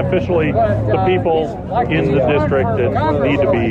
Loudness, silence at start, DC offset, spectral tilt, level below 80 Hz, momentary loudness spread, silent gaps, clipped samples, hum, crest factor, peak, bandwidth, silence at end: -16 LUFS; 0 s; under 0.1%; -9 dB/octave; -34 dBFS; 3 LU; none; under 0.1%; none; 10 dB; -6 dBFS; 7.6 kHz; 0 s